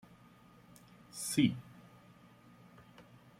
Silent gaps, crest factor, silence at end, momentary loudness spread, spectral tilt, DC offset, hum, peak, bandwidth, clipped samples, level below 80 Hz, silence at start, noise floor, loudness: none; 24 dB; 0.35 s; 28 LU; -4.5 dB/octave; under 0.1%; none; -16 dBFS; 16.5 kHz; under 0.1%; -74 dBFS; 1.15 s; -61 dBFS; -34 LUFS